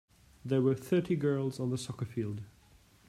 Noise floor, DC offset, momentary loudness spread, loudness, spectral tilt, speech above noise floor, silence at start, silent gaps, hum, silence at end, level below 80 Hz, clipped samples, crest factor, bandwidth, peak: -62 dBFS; under 0.1%; 14 LU; -33 LUFS; -7.5 dB/octave; 30 dB; 0.45 s; none; none; 0.6 s; -66 dBFS; under 0.1%; 16 dB; 15 kHz; -16 dBFS